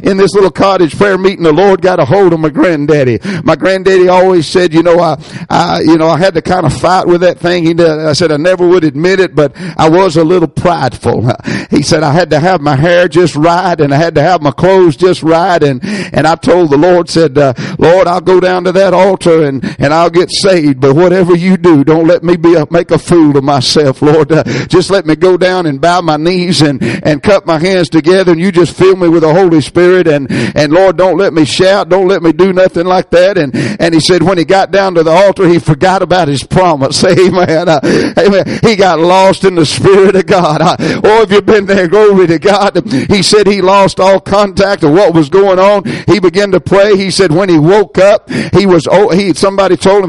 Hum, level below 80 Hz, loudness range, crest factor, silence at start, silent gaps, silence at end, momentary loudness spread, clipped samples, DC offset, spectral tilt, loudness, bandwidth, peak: none; -36 dBFS; 2 LU; 6 dB; 0 s; none; 0 s; 4 LU; 0.4%; under 0.1%; -6 dB/octave; -7 LUFS; 11.5 kHz; 0 dBFS